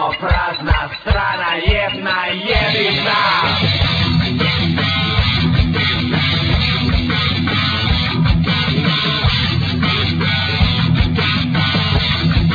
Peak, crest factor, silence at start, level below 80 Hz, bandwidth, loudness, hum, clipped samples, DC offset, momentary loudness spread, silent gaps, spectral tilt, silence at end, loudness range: 0 dBFS; 14 dB; 0 s; -24 dBFS; 5 kHz; -15 LUFS; none; under 0.1%; under 0.1%; 3 LU; none; -6.5 dB/octave; 0 s; 1 LU